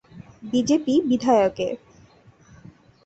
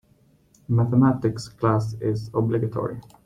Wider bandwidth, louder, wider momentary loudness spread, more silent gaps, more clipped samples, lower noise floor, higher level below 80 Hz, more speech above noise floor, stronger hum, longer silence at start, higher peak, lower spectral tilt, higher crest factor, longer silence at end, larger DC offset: second, 8.2 kHz vs 10.5 kHz; about the same, -21 LUFS vs -23 LUFS; first, 13 LU vs 9 LU; neither; neither; second, -53 dBFS vs -59 dBFS; second, -58 dBFS vs -52 dBFS; second, 32 dB vs 37 dB; neither; second, 0.15 s vs 0.7 s; about the same, -6 dBFS vs -6 dBFS; second, -5.5 dB/octave vs -8.5 dB/octave; about the same, 18 dB vs 18 dB; first, 1.3 s vs 0.25 s; neither